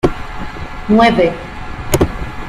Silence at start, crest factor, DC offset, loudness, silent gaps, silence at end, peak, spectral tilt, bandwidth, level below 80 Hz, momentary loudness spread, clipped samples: 0.05 s; 16 dB; under 0.1%; -14 LUFS; none; 0 s; 0 dBFS; -5.5 dB/octave; 16 kHz; -28 dBFS; 17 LU; under 0.1%